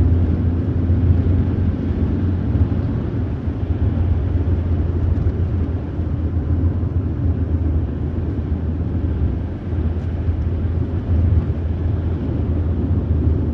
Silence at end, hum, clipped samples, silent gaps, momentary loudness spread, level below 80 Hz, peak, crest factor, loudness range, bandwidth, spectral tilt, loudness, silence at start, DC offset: 0 s; none; under 0.1%; none; 5 LU; -24 dBFS; -4 dBFS; 14 dB; 2 LU; 3.7 kHz; -11 dB/octave; -20 LUFS; 0 s; under 0.1%